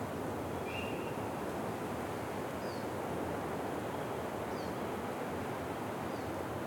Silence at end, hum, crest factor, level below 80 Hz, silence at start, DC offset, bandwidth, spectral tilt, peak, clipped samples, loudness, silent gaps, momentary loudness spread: 0 s; none; 14 dB; -64 dBFS; 0 s; under 0.1%; 17.5 kHz; -5.5 dB/octave; -24 dBFS; under 0.1%; -39 LUFS; none; 1 LU